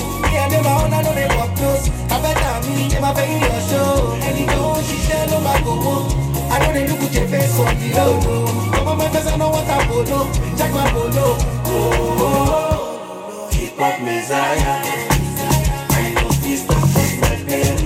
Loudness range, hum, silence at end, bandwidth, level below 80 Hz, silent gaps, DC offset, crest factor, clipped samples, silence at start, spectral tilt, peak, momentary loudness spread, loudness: 2 LU; none; 0 s; 16.5 kHz; -26 dBFS; none; under 0.1%; 16 dB; under 0.1%; 0 s; -5 dB/octave; 0 dBFS; 4 LU; -17 LUFS